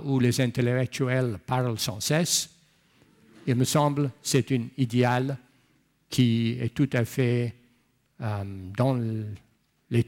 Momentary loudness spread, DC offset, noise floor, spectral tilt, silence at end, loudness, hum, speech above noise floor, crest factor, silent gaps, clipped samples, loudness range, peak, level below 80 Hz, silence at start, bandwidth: 11 LU; under 0.1%; -67 dBFS; -5.5 dB/octave; 0.05 s; -26 LUFS; none; 42 dB; 16 dB; none; under 0.1%; 2 LU; -10 dBFS; -62 dBFS; 0 s; 17 kHz